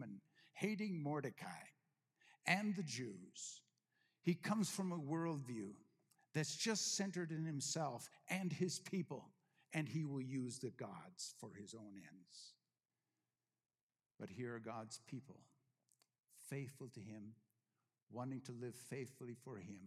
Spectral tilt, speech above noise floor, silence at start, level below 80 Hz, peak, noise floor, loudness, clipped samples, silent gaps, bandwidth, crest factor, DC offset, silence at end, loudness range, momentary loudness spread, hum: -4.5 dB/octave; over 44 dB; 0 s; under -90 dBFS; -20 dBFS; under -90 dBFS; -46 LUFS; under 0.1%; 13.83-13.89 s, 18.03-18.07 s; 15 kHz; 26 dB; under 0.1%; 0 s; 13 LU; 17 LU; none